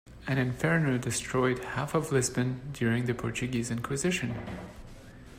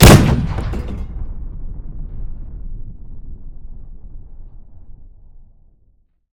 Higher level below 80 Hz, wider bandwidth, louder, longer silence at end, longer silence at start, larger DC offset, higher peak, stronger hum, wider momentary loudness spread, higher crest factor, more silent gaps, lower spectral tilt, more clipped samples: second, -52 dBFS vs -24 dBFS; second, 16 kHz vs 18 kHz; second, -30 LUFS vs -16 LUFS; second, 0 s vs 0.9 s; about the same, 0.05 s vs 0 s; neither; second, -12 dBFS vs 0 dBFS; neither; second, 14 LU vs 24 LU; about the same, 18 dB vs 18 dB; neither; about the same, -5 dB/octave vs -5.5 dB/octave; second, under 0.1% vs 0.8%